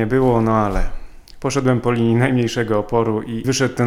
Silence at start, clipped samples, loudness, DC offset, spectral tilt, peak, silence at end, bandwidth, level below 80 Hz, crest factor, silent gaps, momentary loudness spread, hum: 0 s; under 0.1%; -18 LUFS; under 0.1%; -6 dB/octave; -4 dBFS; 0 s; 14.5 kHz; -30 dBFS; 14 dB; none; 7 LU; none